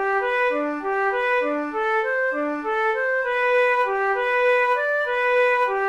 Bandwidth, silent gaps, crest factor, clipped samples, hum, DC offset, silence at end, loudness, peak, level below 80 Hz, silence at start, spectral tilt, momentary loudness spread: 9 kHz; none; 12 dB; under 0.1%; none; under 0.1%; 0 s; -21 LUFS; -10 dBFS; -58 dBFS; 0 s; -3.5 dB/octave; 5 LU